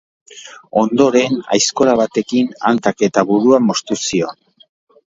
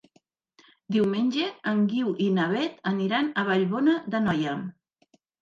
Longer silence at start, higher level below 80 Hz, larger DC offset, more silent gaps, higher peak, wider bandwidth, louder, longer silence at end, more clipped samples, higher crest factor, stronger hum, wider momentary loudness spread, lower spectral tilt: second, 0.35 s vs 0.9 s; first, -58 dBFS vs -68 dBFS; neither; neither; first, 0 dBFS vs -10 dBFS; about the same, 8 kHz vs 7.4 kHz; first, -15 LUFS vs -26 LUFS; about the same, 0.8 s vs 0.7 s; neither; about the same, 16 dB vs 16 dB; neither; first, 8 LU vs 5 LU; second, -4 dB/octave vs -7 dB/octave